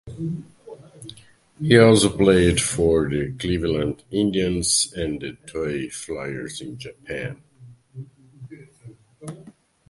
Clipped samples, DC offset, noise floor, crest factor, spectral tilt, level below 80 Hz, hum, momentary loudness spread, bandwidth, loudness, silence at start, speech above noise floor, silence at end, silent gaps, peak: under 0.1%; under 0.1%; -50 dBFS; 22 dB; -4.5 dB/octave; -42 dBFS; none; 25 LU; 12 kHz; -21 LUFS; 0.05 s; 29 dB; 0.4 s; none; 0 dBFS